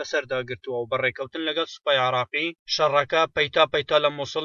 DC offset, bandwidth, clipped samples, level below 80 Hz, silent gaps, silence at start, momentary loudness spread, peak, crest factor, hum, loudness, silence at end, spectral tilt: under 0.1%; 7.2 kHz; under 0.1%; -60 dBFS; 2.59-2.66 s; 0 s; 9 LU; -6 dBFS; 18 dB; none; -23 LUFS; 0 s; -3.5 dB/octave